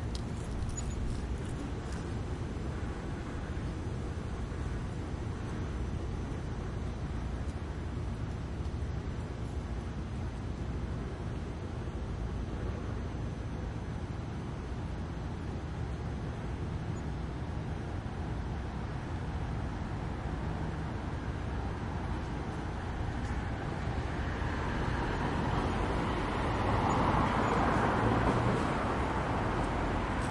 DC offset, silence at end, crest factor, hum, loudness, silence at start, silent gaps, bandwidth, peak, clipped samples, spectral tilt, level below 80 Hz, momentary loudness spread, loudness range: under 0.1%; 0 s; 20 dB; none; -36 LUFS; 0 s; none; 11.5 kHz; -16 dBFS; under 0.1%; -6.5 dB/octave; -40 dBFS; 10 LU; 8 LU